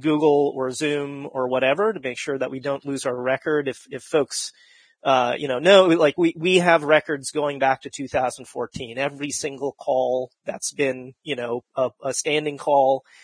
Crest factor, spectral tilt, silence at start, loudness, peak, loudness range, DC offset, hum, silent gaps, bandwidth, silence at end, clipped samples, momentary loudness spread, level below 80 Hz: 20 dB; -4 dB/octave; 0 s; -22 LUFS; -2 dBFS; 7 LU; under 0.1%; none; none; 10.5 kHz; 0.25 s; under 0.1%; 12 LU; -64 dBFS